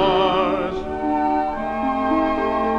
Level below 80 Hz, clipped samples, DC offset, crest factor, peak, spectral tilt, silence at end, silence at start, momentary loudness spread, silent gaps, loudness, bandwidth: -42 dBFS; under 0.1%; under 0.1%; 14 dB; -6 dBFS; -6.5 dB/octave; 0 s; 0 s; 6 LU; none; -21 LUFS; 8.8 kHz